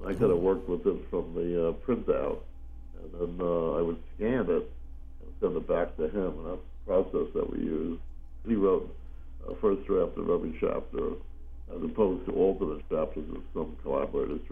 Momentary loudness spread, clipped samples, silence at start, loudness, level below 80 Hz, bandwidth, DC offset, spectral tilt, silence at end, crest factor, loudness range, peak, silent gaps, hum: 18 LU; under 0.1%; 0 s; -30 LUFS; -42 dBFS; 3.7 kHz; under 0.1%; -9.5 dB/octave; 0 s; 18 dB; 2 LU; -12 dBFS; none; none